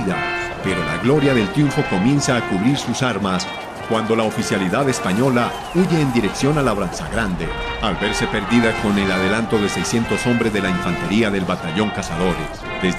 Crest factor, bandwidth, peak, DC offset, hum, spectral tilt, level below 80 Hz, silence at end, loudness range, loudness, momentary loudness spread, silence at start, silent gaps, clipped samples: 14 dB; 14 kHz; -4 dBFS; under 0.1%; none; -5 dB/octave; -38 dBFS; 0 s; 1 LU; -19 LUFS; 6 LU; 0 s; none; under 0.1%